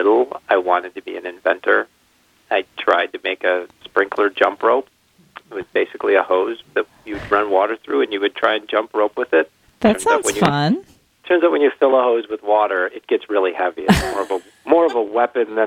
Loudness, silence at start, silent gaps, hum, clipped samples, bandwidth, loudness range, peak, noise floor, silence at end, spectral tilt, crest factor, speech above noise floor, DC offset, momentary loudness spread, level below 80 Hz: -18 LUFS; 0 s; none; none; under 0.1%; 16 kHz; 3 LU; 0 dBFS; -58 dBFS; 0 s; -5 dB/octave; 18 dB; 40 dB; under 0.1%; 8 LU; -46 dBFS